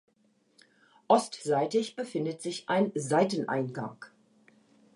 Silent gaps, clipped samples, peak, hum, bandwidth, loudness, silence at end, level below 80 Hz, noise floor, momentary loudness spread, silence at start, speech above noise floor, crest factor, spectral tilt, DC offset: none; under 0.1%; -8 dBFS; none; 11.5 kHz; -29 LUFS; 0.9 s; -80 dBFS; -69 dBFS; 10 LU; 1.1 s; 40 dB; 24 dB; -5 dB/octave; under 0.1%